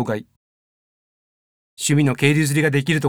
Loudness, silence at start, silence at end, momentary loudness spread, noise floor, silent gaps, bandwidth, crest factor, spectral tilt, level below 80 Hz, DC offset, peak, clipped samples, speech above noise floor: -19 LUFS; 0 s; 0 s; 9 LU; under -90 dBFS; 0.36-1.77 s; 19 kHz; 18 dB; -5 dB/octave; -62 dBFS; under 0.1%; -2 dBFS; under 0.1%; over 72 dB